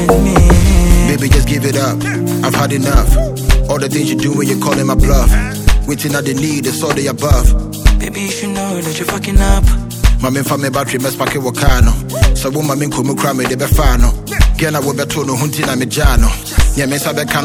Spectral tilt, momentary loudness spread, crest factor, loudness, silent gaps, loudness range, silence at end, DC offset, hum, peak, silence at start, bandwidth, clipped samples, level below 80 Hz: -5 dB/octave; 5 LU; 12 dB; -14 LUFS; none; 2 LU; 0 s; under 0.1%; none; 0 dBFS; 0 s; 18.5 kHz; 0.7%; -14 dBFS